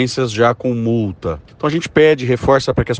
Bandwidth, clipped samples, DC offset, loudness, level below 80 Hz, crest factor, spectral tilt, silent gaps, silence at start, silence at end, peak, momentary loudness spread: 9.6 kHz; under 0.1%; under 0.1%; -16 LUFS; -38 dBFS; 16 dB; -6 dB/octave; none; 0 s; 0 s; 0 dBFS; 9 LU